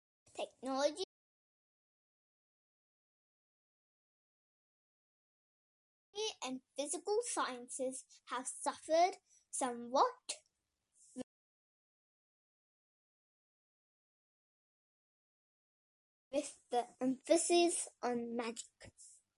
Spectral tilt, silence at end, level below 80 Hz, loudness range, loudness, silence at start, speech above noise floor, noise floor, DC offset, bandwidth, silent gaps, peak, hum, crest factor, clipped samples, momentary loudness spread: -1.5 dB/octave; 0.25 s; -86 dBFS; 17 LU; -38 LUFS; 0.35 s; 47 dB; -85 dBFS; under 0.1%; 11.5 kHz; 1.04-6.13 s, 11.23-16.31 s; -18 dBFS; none; 24 dB; under 0.1%; 18 LU